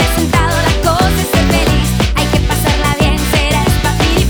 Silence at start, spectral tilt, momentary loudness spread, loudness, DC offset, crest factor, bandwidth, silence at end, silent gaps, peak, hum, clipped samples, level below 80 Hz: 0 s; -4.5 dB/octave; 1 LU; -12 LUFS; 0.3%; 10 dB; over 20 kHz; 0 s; none; -2 dBFS; none; under 0.1%; -18 dBFS